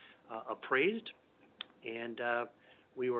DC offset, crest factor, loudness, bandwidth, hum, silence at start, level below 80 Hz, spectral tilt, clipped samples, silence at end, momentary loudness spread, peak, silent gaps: under 0.1%; 20 dB; -37 LUFS; 4.6 kHz; none; 0 s; -88 dBFS; -2 dB/octave; under 0.1%; 0 s; 18 LU; -18 dBFS; none